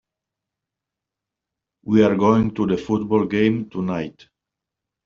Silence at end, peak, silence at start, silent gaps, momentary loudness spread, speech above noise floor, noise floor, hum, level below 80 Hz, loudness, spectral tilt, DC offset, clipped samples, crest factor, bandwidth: 0.95 s; -4 dBFS; 1.85 s; none; 11 LU; 67 dB; -86 dBFS; none; -52 dBFS; -20 LUFS; -6.5 dB/octave; under 0.1%; under 0.1%; 20 dB; 7 kHz